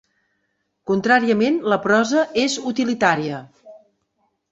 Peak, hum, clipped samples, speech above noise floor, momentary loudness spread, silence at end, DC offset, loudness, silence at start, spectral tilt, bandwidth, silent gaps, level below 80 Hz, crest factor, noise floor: -2 dBFS; none; under 0.1%; 53 dB; 8 LU; 0.75 s; under 0.1%; -19 LUFS; 0.85 s; -4.5 dB/octave; 8 kHz; none; -62 dBFS; 20 dB; -72 dBFS